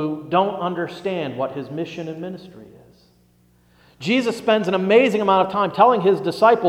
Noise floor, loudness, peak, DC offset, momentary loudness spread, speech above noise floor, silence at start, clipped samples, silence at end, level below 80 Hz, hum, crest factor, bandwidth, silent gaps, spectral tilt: -57 dBFS; -19 LUFS; -2 dBFS; under 0.1%; 15 LU; 38 dB; 0 s; under 0.1%; 0 s; -62 dBFS; 60 Hz at -55 dBFS; 18 dB; 14.5 kHz; none; -6 dB/octave